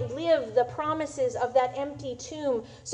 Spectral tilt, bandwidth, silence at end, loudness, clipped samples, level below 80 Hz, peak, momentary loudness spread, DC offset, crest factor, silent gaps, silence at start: -5 dB/octave; 10 kHz; 0 s; -28 LUFS; under 0.1%; -60 dBFS; -10 dBFS; 10 LU; under 0.1%; 18 dB; none; 0 s